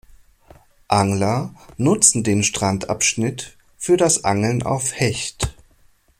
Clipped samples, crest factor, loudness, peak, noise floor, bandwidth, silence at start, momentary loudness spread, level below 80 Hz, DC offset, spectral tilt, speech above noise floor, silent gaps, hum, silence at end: under 0.1%; 20 dB; -19 LUFS; 0 dBFS; -55 dBFS; 16.5 kHz; 0.9 s; 13 LU; -44 dBFS; under 0.1%; -4 dB/octave; 36 dB; none; none; 0.7 s